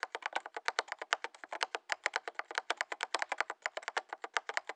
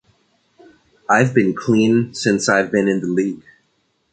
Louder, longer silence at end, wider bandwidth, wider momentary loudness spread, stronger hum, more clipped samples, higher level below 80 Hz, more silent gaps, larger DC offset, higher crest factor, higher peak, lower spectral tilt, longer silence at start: second, -38 LUFS vs -17 LUFS; second, 0 s vs 0.75 s; first, 13 kHz vs 9.4 kHz; second, 4 LU vs 8 LU; neither; neither; second, under -90 dBFS vs -58 dBFS; neither; neither; first, 30 dB vs 16 dB; second, -10 dBFS vs -2 dBFS; second, 2.5 dB/octave vs -5.5 dB/octave; second, 0.05 s vs 1.1 s